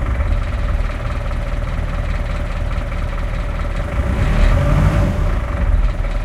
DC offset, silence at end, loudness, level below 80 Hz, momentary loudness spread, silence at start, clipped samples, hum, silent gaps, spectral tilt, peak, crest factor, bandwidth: under 0.1%; 0 s; -20 LUFS; -18 dBFS; 8 LU; 0 s; under 0.1%; none; none; -7 dB/octave; -2 dBFS; 16 dB; 10.5 kHz